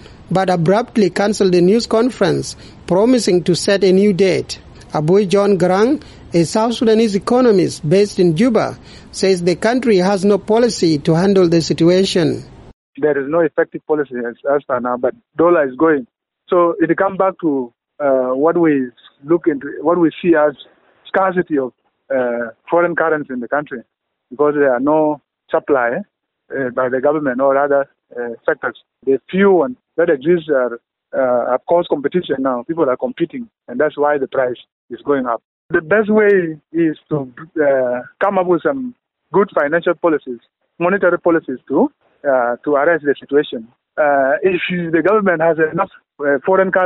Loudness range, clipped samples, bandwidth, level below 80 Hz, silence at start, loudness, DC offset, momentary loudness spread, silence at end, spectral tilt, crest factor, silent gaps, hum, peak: 4 LU; under 0.1%; 11.5 kHz; -52 dBFS; 0.1 s; -16 LUFS; under 0.1%; 10 LU; 0 s; -6 dB/octave; 12 dB; 12.73-12.93 s, 34.72-34.88 s, 35.44-35.69 s; none; -2 dBFS